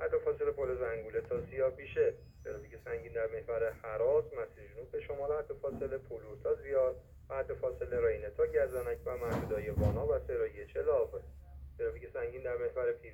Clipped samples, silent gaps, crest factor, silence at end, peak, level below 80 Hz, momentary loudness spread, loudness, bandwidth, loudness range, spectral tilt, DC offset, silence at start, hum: under 0.1%; none; 18 dB; 0 s; -18 dBFS; -52 dBFS; 12 LU; -36 LUFS; 16.5 kHz; 3 LU; -8 dB/octave; under 0.1%; 0 s; none